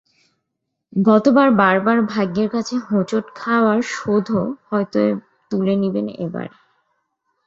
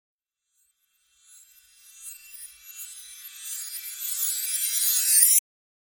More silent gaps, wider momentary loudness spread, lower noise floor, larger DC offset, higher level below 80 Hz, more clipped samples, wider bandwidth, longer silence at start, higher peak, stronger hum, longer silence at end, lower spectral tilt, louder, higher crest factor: neither; second, 13 LU vs 25 LU; about the same, -77 dBFS vs -74 dBFS; neither; first, -60 dBFS vs -80 dBFS; neither; second, 7.8 kHz vs 19 kHz; second, 0.95 s vs 1.95 s; about the same, 0 dBFS vs -2 dBFS; neither; first, 1 s vs 0.6 s; first, -7 dB/octave vs 8 dB/octave; first, -18 LUFS vs -21 LUFS; second, 18 dB vs 26 dB